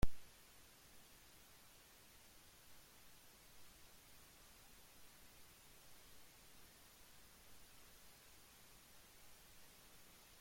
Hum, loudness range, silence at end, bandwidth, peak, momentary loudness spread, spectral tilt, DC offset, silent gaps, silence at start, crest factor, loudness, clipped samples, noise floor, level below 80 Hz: none; 0 LU; 0 s; 16.5 kHz; -22 dBFS; 1 LU; -4 dB/octave; under 0.1%; none; 0 s; 26 dB; -62 LUFS; under 0.1%; -65 dBFS; -58 dBFS